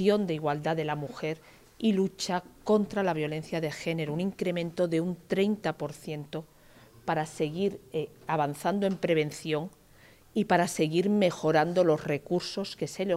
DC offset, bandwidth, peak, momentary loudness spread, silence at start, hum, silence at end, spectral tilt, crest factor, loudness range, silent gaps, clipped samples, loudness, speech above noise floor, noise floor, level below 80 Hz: under 0.1%; 16 kHz; -10 dBFS; 10 LU; 0 s; none; 0 s; -6 dB/octave; 20 dB; 5 LU; none; under 0.1%; -29 LUFS; 28 dB; -57 dBFS; -64 dBFS